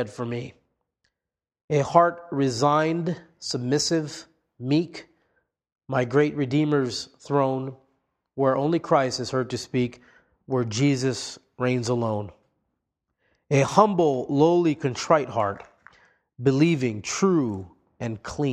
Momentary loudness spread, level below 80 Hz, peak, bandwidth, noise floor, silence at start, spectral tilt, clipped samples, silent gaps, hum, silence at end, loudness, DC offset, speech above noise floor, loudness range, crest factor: 13 LU; -62 dBFS; -2 dBFS; 11.5 kHz; -88 dBFS; 0 s; -6 dB/octave; under 0.1%; 1.64-1.68 s; none; 0 s; -24 LUFS; under 0.1%; 65 dB; 4 LU; 24 dB